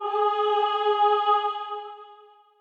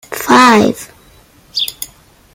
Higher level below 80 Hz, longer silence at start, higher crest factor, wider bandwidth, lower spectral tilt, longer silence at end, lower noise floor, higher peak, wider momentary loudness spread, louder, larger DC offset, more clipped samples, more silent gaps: second, under -90 dBFS vs -48 dBFS; about the same, 0 s vs 0.1 s; about the same, 14 dB vs 14 dB; second, 6.6 kHz vs 17.5 kHz; second, -1 dB/octave vs -3.5 dB/octave; about the same, 0.45 s vs 0.5 s; first, -52 dBFS vs -45 dBFS; second, -10 dBFS vs 0 dBFS; second, 14 LU vs 21 LU; second, -23 LUFS vs -11 LUFS; neither; neither; neither